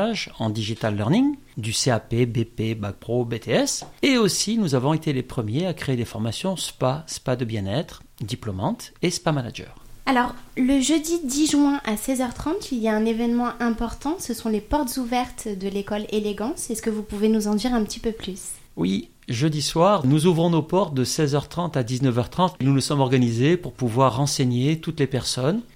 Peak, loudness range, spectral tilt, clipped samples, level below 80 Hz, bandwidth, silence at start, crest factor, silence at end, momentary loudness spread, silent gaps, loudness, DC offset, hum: -6 dBFS; 5 LU; -5 dB/octave; under 0.1%; -46 dBFS; 16.5 kHz; 0 s; 18 dB; 0.1 s; 9 LU; none; -23 LUFS; under 0.1%; none